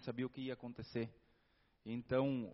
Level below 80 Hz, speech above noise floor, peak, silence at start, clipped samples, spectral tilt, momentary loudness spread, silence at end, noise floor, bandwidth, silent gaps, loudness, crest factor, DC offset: -72 dBFS; 34 dB; -24 dBFS; 0 s; under 0.1%; -6.5 dB/octave; 11 LU; 0 s; -76 dBFS; 5.8 kHz; none; -43 LUFS; 20 dB; under 0.1%